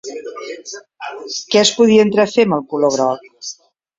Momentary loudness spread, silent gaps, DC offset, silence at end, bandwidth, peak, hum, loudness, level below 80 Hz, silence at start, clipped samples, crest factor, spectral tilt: 19 LU; none; under 0.1%; 0.45 s; 8 kHz; 0 dBFS; none; -14 LUFS; -60 dBFS; 0.05 s; under 0.1%; 16 dB; -4 dB/octave